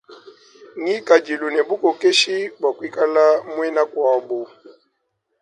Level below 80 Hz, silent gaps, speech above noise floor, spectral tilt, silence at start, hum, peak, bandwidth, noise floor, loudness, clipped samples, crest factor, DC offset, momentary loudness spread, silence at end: -74 dBFS; none; 54 dB; -2 dB/octave; 0.1 s; none; 0 dBFS; 11 kHz; -72 dBFS; -19 LUFS; under 0.1%; 20 dB; under 0.1%; 12 LU; 0.7 s